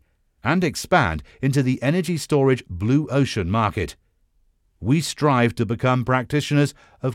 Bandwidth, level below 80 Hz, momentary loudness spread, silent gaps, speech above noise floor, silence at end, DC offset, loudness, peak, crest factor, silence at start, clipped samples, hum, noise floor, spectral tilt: 15.5 kHz; -48 dBFS; 6 LU; none; 42 dB; 0 s; under 0.1%; -21 LUFS; -4 dBFS; 18 dB; 0.45 s; under 0.1%; none; -63 dBFS; -6 dB/octave